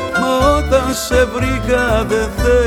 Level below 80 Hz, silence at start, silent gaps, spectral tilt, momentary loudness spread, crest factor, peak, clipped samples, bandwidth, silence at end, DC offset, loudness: -22 dBFS; 0 s; none; -5 dB/octave; 3 LU; 12 dB; -2 dBFS; under 0.1%; 18 kHz; 0 s; under 0.1%; -15 LUFS